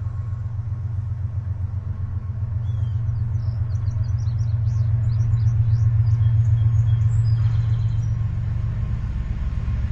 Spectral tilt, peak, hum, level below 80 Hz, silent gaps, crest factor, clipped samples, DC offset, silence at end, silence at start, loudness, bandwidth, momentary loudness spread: -9 dB/octave; -8 dBFS; none; -32 dBFS; none; 12 dB; under 0.1%; under 0.1%; 0 s; 0 s; -23 LUFS; 6 kHz; 9 LU